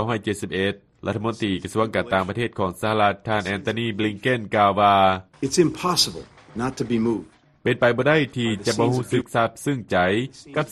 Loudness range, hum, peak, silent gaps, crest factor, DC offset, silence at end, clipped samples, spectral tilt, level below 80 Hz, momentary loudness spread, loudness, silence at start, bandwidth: 3 LU; none; -4 dBFS; none; 18 dB; under 0.1%; 0 s; under 0.1%; -5 dB/octave; -54 dBFS; 9 LU; -22 LUFS; 0 s; 13 kHz